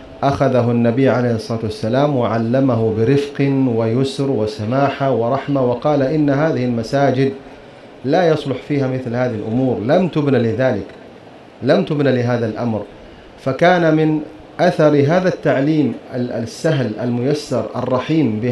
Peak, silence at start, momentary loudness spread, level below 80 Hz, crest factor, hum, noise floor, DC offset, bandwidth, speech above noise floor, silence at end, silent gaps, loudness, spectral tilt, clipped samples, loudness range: 0 dBFS; 0 s; 8 LU; -50 dBFS; 16 dB; none; -40 dBFS; under 0.1%; 11.5 kHz; 24 dB; 0 s; none; -17 LUFS; -7.5 dB/octave; under 0.1%; 3 LU